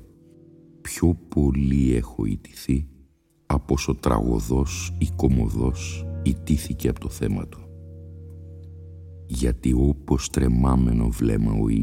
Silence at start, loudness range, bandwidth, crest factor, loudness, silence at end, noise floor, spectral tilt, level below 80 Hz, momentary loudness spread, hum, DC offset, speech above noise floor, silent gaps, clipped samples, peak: 0 s; 5 LU; 16 kHz; 20 dB; -24 LUFS; 0 s; -57 dBFS; -7 dB/octave; -30 dBFS; 21 LU; none; under 0.1%; 36 dB; none; under 0.1%; -4 dBFS